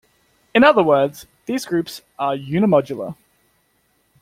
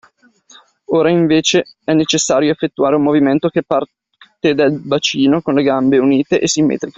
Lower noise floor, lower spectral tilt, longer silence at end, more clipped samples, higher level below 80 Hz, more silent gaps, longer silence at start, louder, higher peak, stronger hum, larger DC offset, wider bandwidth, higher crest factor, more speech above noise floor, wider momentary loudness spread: first, -64 dBFS vs -49 dBFS; first, -6 dB/octave vs -4.5 dB/octave; first, 1.1 s vs 0.05 s; neither; about the same, -58 dBFS vs -54 dBFS; neither; second, 0.55 s vs 0.9 s; second, -18 LUFS vs -14 LUFS; about the same, 0 dBFS vs 0 dBFS; neither; neither; first, 16 kHz vs 8 kHz; about the same, 18 dB vs 14 dB; first, 46 dB vs 35 dB; first, 17 LU vs 5 LU